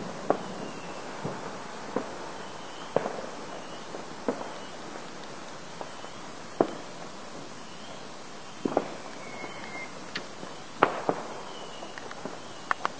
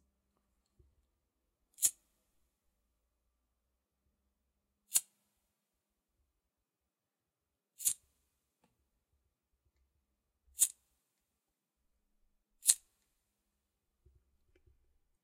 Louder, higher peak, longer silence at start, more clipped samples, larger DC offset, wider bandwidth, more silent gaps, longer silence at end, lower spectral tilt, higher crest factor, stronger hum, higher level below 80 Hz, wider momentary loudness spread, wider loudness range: second, -36 LUFS vs -33 LUFS; about the same, -2 dBFS vs -2 dBFS; second, 0 s vs 1.8 s; neither; first, 0.6% vs under 0.1%; second, 8 kHz vs 16 kHz; neither; second, 0 s vs 2.5 s; first, -4 dB/octave vs 3.5 dB/octave; second, 34 dB vs 42 dB; neither; first, -66 dBFS vs -80 dBFS; first, 12 LU vs 6 LU; second, 4 LU vs 7 LU